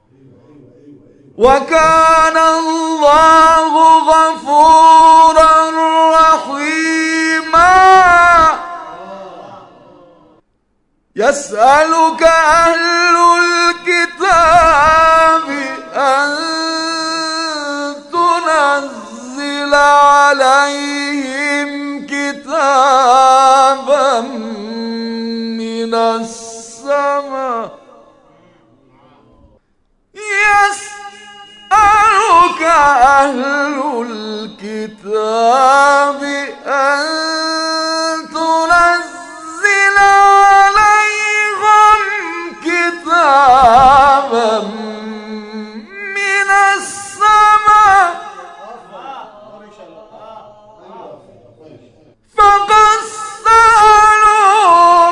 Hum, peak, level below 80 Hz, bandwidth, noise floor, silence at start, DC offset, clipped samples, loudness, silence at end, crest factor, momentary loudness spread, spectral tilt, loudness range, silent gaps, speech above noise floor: none; 0 dBFS; -40 dBFS; 12 kHz; -61 dBFS; 1.4 s; under 0.1%; 0.7%; -10 LUFS; 0 s; 12 dB; 17 LU; -2.5 dB/octave; 9 LU; none; 52 dB